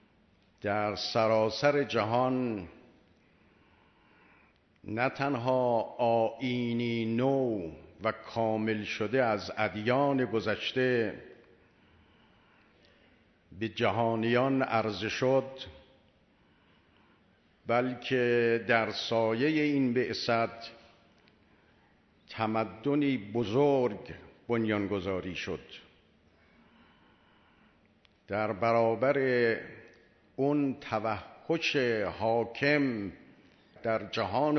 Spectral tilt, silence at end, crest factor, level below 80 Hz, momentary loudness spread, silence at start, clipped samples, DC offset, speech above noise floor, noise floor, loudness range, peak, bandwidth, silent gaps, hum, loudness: -6.5 dB/octave; 0 s; 22 dB; -68 dBFS; 12 LU; 0.65 s; under 0.1%; under 0.1%; 36 dB; -66 dBFS; 6 LU; -10 dBFS; 6.4 kHz; none; none; -30 LUFS